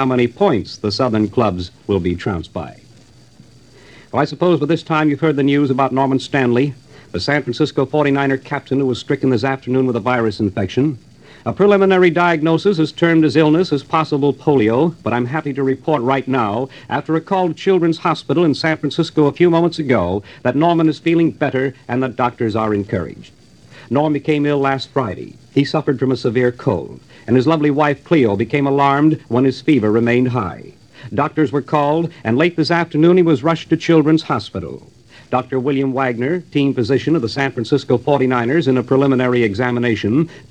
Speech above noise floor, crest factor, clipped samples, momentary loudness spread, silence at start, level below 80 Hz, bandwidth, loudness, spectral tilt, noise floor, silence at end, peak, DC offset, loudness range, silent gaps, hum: 30 dB; 16 dB; under 0.1%; 8 LU; 0 s; -52 dBFS; 9 kHz; -16 LUFS; -7.5 dB/octave; -46 dBFS; 0.1 s; 0 dBFS; 0.2%; 4 LU; none; none